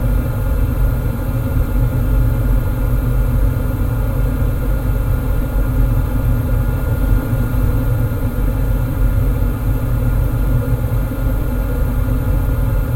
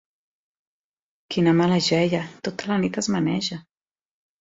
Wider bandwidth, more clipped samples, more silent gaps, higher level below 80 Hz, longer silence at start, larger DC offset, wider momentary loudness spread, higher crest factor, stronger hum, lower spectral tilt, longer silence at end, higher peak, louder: first, 17 kHz vs 7.8 kHz; neither; neither; first, -18 dBFS vs -60 dBFS; second, 0 s vs 1.3 s; neither; second, 2 LU vs 11 LU; second, 12 dB vs 18 dB; neither; first, -8 dB/octave vs -5.5 dB/octave; second, 0 s vs 0.8 s; first, -2 dBFS vs -6 dBFS; first, -18 LUFS vs -23 LUFS